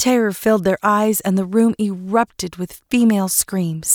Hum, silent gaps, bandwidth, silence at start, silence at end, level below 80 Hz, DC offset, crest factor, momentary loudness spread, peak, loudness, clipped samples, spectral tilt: none; none; over 20 kHz; 0 s; 0 s; -52 dBFS; under 0.1%; 14 dB; 7 LU; -4 dBFS; -18 LUFS; under 0.1%; -4.5 dB/octave